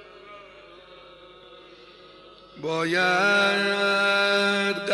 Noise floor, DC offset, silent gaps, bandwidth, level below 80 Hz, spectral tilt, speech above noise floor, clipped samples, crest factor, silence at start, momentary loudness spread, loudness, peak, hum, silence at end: -49 dBFS; under 0.1%; none; 11.5 kHz; -66 dBFS; -3.5 dB/octave; 26 dB; under 0.1%; 14 dB; 0 s; 7 LU; -21 LUFS; -12 dBFS; 50 Hz at -65 dBFS; 0 s